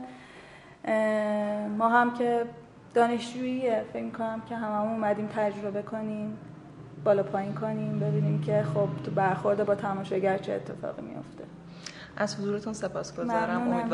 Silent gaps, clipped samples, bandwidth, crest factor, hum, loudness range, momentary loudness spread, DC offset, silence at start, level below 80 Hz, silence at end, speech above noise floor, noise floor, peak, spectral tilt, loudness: none; under 0.1%; 11.5 kHz; 20 dB; none; 5 LU; 17 LU; under 0.1%; 0 s; -64 dBFS; 0 s; 21 dB; -50 dBFS; -8 dBFS; -7 dB/octave; -29 LUFS